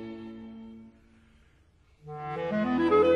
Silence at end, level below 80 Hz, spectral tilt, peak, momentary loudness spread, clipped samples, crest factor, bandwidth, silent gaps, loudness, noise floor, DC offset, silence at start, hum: 0 s; -60 dBFS; -8 dB/octave; -10 dBFS; 23 LU; under 0.1%; 18 dB; 6.8 kHz; none; -28 LUFS; -62 dBFS; under 0.1%; 0 s; none